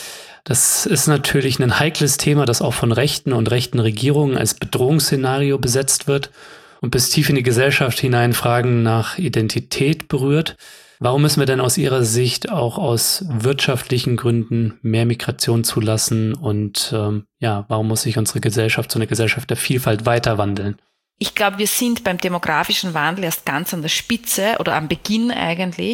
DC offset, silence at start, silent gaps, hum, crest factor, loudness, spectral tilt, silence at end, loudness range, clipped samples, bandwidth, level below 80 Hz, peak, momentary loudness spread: under 0.1%; 0 s; none; none; 18 dB; -18 LUFS; -4.5 dB/octave; 0 s; 3 LU; under 0.1%; 17 kHz; -48 dBFS; 0 dBFS; 6 LU